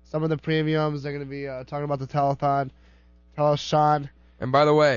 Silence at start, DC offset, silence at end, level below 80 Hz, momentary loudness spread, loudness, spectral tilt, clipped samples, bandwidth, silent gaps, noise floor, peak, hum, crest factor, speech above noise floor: 0.15 s; under 0.1%; 0 s; -54 dBFS; 12 LU; -24 LUFS; -6.5 dB/octave; under 0.1%; 7.4 kHz; none; -54 dBFS; -8 dBFS; none; 16 dB; 31 dB